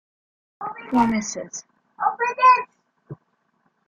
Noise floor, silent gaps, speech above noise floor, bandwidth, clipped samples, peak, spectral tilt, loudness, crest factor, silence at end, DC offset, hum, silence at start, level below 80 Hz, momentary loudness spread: -68 dBFS; none; 48 dB; 7.8 kHz; under 0.1%; -4 dBFS; -4 dB/octave; -20 LUFS; 18 dB; 0.75 s; under 0.1%; none; 0.6 s; -60 dBFS; 19 LU